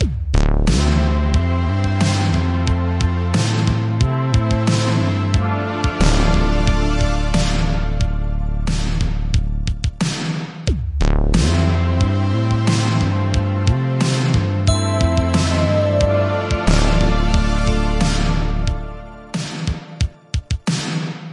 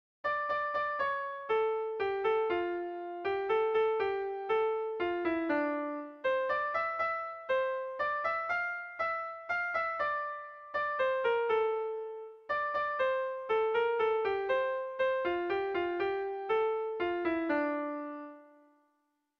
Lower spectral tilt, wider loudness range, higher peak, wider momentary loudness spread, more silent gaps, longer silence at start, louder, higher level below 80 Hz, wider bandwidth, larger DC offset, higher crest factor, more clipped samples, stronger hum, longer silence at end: about the same, -6 dB/octave vs -5.5 dB/octave; about the same, 4 LU vs 2 LU; first, -2 dBFS vs -20 dBFS; about the same, 7 LU vs 7 LU; neither; second, 0 s vs 0.25 s; first, -19 LUFS vs -33 LUFS; first, -22 dBFS vs -70 dBFS; first, 11 kHz vs 6.4 kHz; neither; about the same, 16 dB vs 14 dB; neither; neither; second, 0 s vs 0.95 s